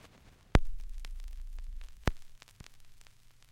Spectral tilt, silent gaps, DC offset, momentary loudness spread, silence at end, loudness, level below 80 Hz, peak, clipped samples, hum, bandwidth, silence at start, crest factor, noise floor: -6 dB/octave; none; under 0.1%; 24 LU; 0.2 s; -38 LUFS; -38 dBFS; -6 dBFS; under 0.1%; none; 13 kHz; 0.05 s; 30 dB; -59 dBFS